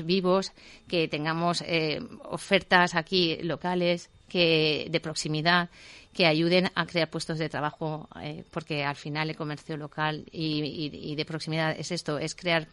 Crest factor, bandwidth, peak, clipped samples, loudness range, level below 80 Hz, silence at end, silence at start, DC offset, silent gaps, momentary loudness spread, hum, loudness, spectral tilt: 24 dB; 11.5 kHz; -6 dBFS; under 0.1%; 7 LU; -60 dBFS; 0.05 s; 0 s; under 0.1%; none; 13 LU; none; -27 LUFS; -5 dB/octave